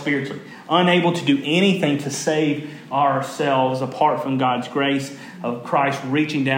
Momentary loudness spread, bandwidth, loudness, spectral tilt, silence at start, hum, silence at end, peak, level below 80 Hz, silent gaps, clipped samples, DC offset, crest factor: 11 LU; 16.5 kHz; -20 LUFS; -5 dB/octave; 0 s; none; 0 s; -4 dBFS; -76 dBFS; none; under 0.1%; under 0.1%; 18 dB